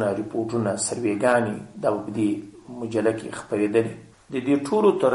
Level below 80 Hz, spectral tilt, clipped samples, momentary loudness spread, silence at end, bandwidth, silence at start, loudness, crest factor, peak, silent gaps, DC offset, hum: -62 dBFS; -5.5 dB/octave; under 0.1%; 12 LU; 0 s; 11.5 kHz; 0 s; -24 LUFS; 16 dB; -6 dBFS; none; under 0.1%; none